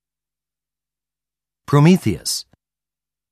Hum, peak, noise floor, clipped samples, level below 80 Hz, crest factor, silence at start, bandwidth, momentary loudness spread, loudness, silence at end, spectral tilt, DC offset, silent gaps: none; -4 dBFS; -90 dBFS; under 0.1%; -52 dBFS; 18 dB; 1.7 s; 14 kHz; 10 LU; -17 LUFS; 0.9 s; -6 dB/octave; under 0.1%; none